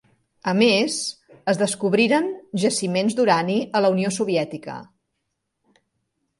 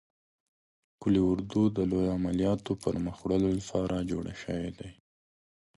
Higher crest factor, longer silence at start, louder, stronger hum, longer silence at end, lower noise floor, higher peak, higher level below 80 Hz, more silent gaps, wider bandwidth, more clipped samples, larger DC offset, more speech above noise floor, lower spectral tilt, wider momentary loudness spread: about the same, 18 dB vs 16 dB; second, 0.45 s vs 1 s; first, -21 LUFS vs -30 LUFS; neither; first, 1.55 s vs 0.85 s; second, -77 dBFS vs under -90 dBFS; first, -4 dBFS vs -14 dBFS; second, -68 dBFS vs -50 dBFS; neither; about the same, 11.5 kHz vs 11.5 kHz; neither; neither; second, 56 dB vs over 61 dB; second, -4.5 dB/octave vs -7.5 dB/octave; first, 12 LU vs 9 LU